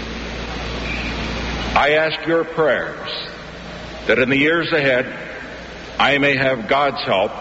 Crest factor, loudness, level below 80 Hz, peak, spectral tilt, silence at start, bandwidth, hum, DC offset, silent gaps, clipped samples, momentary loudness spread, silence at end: 16 dB; -18 LUFS; -36 dBFS; -2 dBFS; -2.5 dB/octave; 0 s; 8 kHz; none; under 0.1%; none; under 0.1%; 16 LU; 0 s